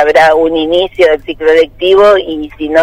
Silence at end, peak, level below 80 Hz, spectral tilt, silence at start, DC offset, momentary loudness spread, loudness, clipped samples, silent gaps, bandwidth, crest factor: 0 s; 0 dBFS; -36 dBFS; -4.5 dB/octave; 0 s; under 0.1%; 6 LU; -9 LUFS; 0.8%; none; 12 kHz; 8 dB